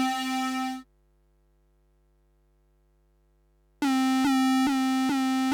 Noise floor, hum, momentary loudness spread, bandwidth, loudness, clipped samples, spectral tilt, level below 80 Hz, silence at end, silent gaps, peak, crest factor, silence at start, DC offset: -65 dBFS; 50 Hz at -65 dBFS; 8 LU; 19.5 kHz; -26 LUFS; under 0.1%; -2.5 dB/octave; -64 dBFS; 0 s; none; -18 dBFS; 12 dB; 0 s; under 0.1%